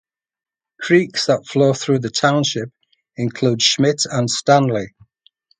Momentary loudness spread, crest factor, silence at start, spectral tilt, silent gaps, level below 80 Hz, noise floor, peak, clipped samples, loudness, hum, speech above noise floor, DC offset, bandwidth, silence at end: 11 LU; 18 dB; 0.8 s; -4.5 dB/octave; none; -60 dBFS; -58 dBFS; 0 dBFS; under 0.1%; -17 LUFS; none; 41 dB; under 0.1%; 9.6 kHz; 0.7 s